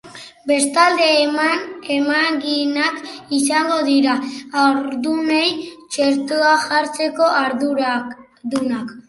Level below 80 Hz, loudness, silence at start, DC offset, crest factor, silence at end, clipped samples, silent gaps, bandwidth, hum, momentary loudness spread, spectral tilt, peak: -66 dBFS; -17 LUFS; 0.05 s; under 0.1%; 18 dB; 0.1 s; under 0.1%; none; 11.5 kHz; none; 10 LU; -2 dB/octave; 0 dBFS